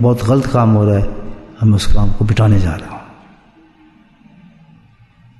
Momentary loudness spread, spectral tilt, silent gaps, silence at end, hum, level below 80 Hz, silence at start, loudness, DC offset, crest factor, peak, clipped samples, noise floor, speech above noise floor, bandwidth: 20 LU; -7.5 dB/octave; none; 2.4 s; none; -24 dBFS; 0 s; -14 LUFS; under 0.1%; 14 dB; -2 dBFS; under 0.1%; -47 dBFS; 36 dB; 12 kHz